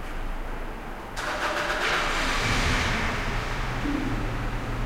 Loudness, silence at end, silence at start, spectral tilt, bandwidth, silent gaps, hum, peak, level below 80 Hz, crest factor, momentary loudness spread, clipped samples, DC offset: -27 LUFS; 0 s; 0 s; -4 dB/octave; 16 kHz; none; none; -12 dBFS; -32 dBFS; 16 dB; 12 LU; under 0.1%; 0.2%